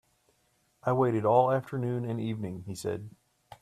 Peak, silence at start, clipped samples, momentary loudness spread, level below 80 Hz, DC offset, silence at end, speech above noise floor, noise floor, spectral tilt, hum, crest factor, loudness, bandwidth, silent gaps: -10 dBFS; 0.85 s; under 0.1%; 13 LU; -68 dBFS; under 0.1%; 0.5 s; 43 dB; -71 dBFS; -7.5 dB/octave; none; 20 dB; -29 LUFS; 13.5 kHz; none